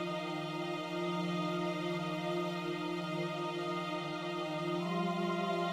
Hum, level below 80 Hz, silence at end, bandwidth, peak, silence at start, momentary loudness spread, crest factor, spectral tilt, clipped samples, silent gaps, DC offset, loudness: none; -78 dBFS; 0 s; 15.5 kHz; -24 dBFS; 0 s; 4 LU; 14 dB; -6 dB/octave; under 0.1%; none; under 0.1%; -37 LUFS